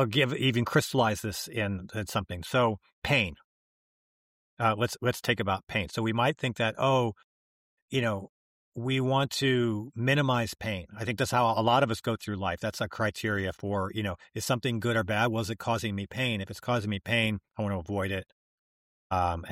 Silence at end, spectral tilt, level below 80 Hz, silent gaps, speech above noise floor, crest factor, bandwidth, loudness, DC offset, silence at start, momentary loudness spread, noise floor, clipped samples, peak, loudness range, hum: 0 s; -5 dB/octave; -56 dBFS; 2.93-3.02 s, 3.44-4.57 s, 5.63-5.67 s, 7.24-7.88 s, 8.29-8.72 s, 18.32-19.10 s; over 61 dB; 18 dB; 16 kHz; -29 LUFS; under 0.1%; 0 s; 8 LU; under -90 dBFS; under 0.1%; -12 dBFS; 3 LU; none